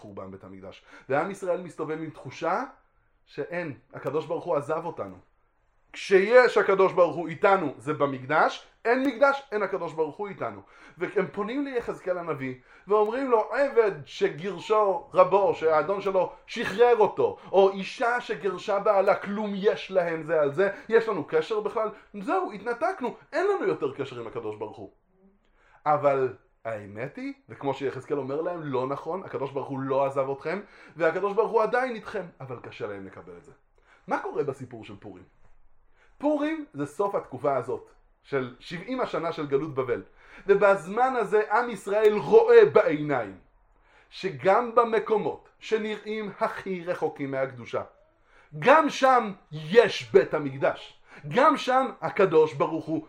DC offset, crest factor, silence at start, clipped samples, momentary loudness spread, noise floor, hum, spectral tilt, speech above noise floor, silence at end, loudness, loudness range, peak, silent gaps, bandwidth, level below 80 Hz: under 0.1%; 22 dB; 0 s; under 0.1%; 16 LU; -66 dBFS; none; -6 dB/octave; 40 dB; 0 s; -26 LUFS; 10 LU; -4 dBFS; none; 10.5 kHz; -64 dBFS